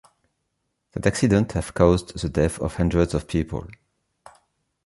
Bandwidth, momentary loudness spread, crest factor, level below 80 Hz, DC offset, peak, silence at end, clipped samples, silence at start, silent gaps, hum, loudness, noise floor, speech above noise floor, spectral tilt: 11.5 kHz; 8 LU; 22 dB; -36 dBFS; under 0.1%; -2 dBFS; 1.1 s; under 0.1%; 0.95 s; none; none; -22 LUFS; -76 dBFS; 54 dB; -6.5 dB/octave